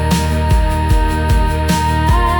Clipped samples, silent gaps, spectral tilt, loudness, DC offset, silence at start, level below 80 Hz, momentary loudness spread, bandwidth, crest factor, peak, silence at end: under 0.1%; none; -5.5 dB/octave; -15 LUFS; under 0.1%; 0 s; -16 dBFS; 1 LU; 18 kHz; 10 dB; -2 dBFS; 0 s